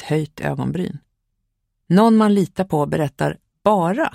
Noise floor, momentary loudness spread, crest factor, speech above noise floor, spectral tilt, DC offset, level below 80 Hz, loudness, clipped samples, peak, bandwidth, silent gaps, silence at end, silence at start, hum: -73 dBFS; 11 LU; 18 dB; 55 dB; -7.5 dB/octave; under 0.1%; -52 dBFS; -19 LUFS; under 0.1%; -2 dBFS; 15 kHz; none; 0.05 s; 0 s; none